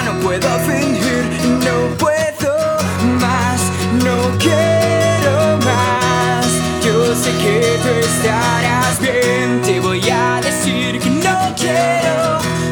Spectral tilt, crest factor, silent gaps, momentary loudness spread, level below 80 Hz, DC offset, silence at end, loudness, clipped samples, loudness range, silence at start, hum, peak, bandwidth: -4.5 dB/octave; 14 dB; none; 3 LU; -40 dBFS; under 0.1%; 0 s; -14 LUFS; under 0.1%; 2 LU; 0 s; none; -2 dBFS; 19 kHz